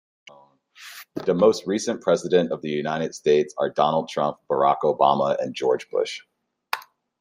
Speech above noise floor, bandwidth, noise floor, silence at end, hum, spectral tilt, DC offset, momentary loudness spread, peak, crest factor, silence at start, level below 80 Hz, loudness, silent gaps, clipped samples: 31 dB; 16 kHz; -53 dBFS; 0.4 s; none; -5 dB/octave; under 0.1%; 12 LU; -4 dBFS; 20 dB; 0.8 s; -68 dBFS; -23 LUFS; none; under 0.1%